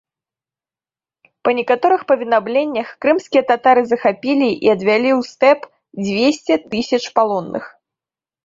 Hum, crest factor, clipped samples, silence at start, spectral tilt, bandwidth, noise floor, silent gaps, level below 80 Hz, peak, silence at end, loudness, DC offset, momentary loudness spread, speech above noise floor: none; 16 dB; under 0.1%; 1.45 s; -5 dB/octave; 7.8 kHz; under -90 dBFS; none; -62 dBFS; -2 dBFS; 0.8 s; -16 LUFS; under 0.1%; 8 LU; over 74 dB